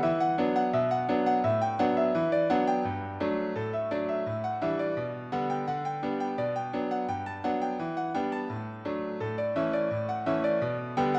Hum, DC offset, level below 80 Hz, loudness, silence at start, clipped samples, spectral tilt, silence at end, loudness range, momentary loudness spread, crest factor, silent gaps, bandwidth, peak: none; under 0.1%; -64 dBFS; -29 LUFS; 0 s; under 0.1%; -8 dB/octave; 0 s; 5 LU; 7 LU; 16 dB; none; 8 kHz; -14 dBFS